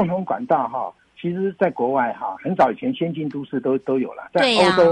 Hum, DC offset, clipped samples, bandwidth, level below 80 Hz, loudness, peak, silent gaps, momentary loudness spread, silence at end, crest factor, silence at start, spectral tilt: none; under 0.1%; under 0.1%; 11 kHz; -60 dBFS; -21 LUFS; -4 dBFS; none; 12 LU; 0 s; 16 dB; 0 s; -5.5 dB/octave